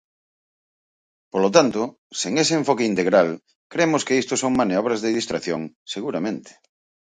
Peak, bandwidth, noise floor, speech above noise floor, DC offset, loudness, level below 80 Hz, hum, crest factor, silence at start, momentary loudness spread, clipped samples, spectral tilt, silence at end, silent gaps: -2 dBFS; 9.6 kHz; under -90 dBFS; over 69 dB; under 0.1%; -21 LUFS; -62 dBFS; none; 22 dB; 1.35 s; 12 LU; under 0.1%; -4 dB/octave; 0.6 s; 1.98-2.10 s, 3.55-3.70 s, 5.76-5.86 s